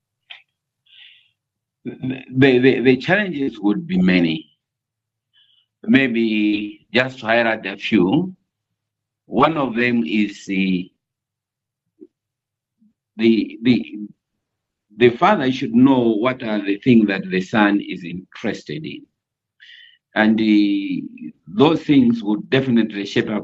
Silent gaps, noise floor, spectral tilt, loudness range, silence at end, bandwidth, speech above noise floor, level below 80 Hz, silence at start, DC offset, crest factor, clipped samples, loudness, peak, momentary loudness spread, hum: none; -84 dBFS; -7 dB/octave; 6 LU; 0 s; 7.8 kHz; 67 dB; -58 dBFS; 0.3 s; under 0.1%; 18 dB; under 0.1%; -18 LUFS; -2 dBFS; 15 LU; none